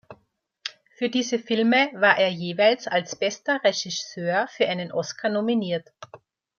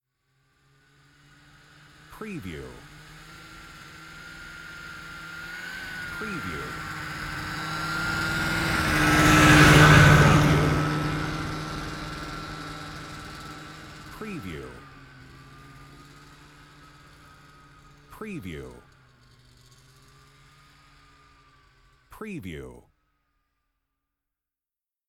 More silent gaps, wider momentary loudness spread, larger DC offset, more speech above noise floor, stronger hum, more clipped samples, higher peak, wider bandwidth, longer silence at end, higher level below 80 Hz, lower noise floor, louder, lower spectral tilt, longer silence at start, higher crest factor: neither; second, 11 LU vs 28 LU; neither; second, 45 dB vs over 54 dB; neither; neither; about the same, -4 dBFS vs -2 dBFS; second, 7.2 kHz vs 17 kHz; second, 0.4 s vs 2.35 s; second, -74 dBFS vs -40 dBFS; second, -68 dBFS vs under -90 dBFS; about the same, -23 LUFS vs -21 LUFS; about the same, -4 dB/octave vs -5 dB/octave; second, 0.1 s vs 2.1 s; about the same, 20 dB vs 24 dB